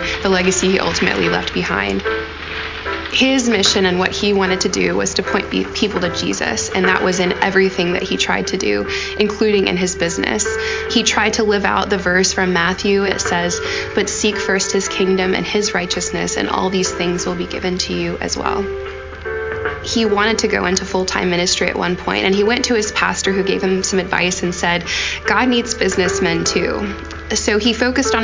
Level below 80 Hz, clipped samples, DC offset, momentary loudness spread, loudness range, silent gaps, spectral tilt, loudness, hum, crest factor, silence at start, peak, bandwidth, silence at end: -36 dBFS; under 0.1%; under 0.1%; 6 LU; 3 LU; none; -3.5 dB/octave; -16 LUFS; none; 16 dB; 0 s; 0 dBFS; 7.8 kHz; 0 s